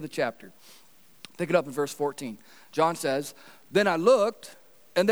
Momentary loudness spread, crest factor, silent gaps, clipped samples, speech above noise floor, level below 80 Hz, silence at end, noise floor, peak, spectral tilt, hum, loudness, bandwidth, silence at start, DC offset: 20 LU; 20 dB; none; under 0.1%; 25 dB; -84 dBFS; 0 s; -52 dBFS; -8 dBFS; -4.5 dB/octave; none; -26 LUFS; over 20 kHz; 0 s; 0.2%